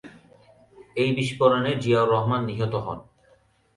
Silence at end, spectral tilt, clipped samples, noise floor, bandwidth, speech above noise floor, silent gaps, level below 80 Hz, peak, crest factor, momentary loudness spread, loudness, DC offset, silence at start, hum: 0.75 s; -7 dB/octave; under 0.1%; -61 dBFS; 11.5 kHz; 38 dB; none; -56 dBFS; -6 dBFS; 20 dB; 13 LU; -23 LUFS; under 0.1%; 0.05 s; none